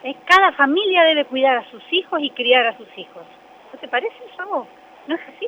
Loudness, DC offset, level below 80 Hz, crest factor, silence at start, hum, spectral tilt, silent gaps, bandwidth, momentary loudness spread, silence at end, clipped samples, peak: -17 LUFS; under 0.1%; -66 dBFS; 18 dB; 0.05 s; none; -2.5 dB/octave; none; 19.5 kHz; 21 LU; 0 s; under 0.1%; 0 dBFS